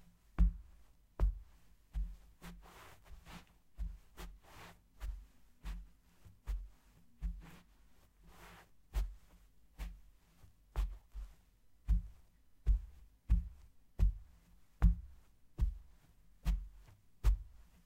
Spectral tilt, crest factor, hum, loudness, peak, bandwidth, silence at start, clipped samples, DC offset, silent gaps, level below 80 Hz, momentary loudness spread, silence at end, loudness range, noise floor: -7 dB/octave; 24 dB; none; -42 LUFS; -18 dBFS; 8.6 kHz; 0.4 s; under 0.1%; under 0.1%; none; -40 dBFS; 22 LU; 0.3 s; 13 LU; -66 dBFS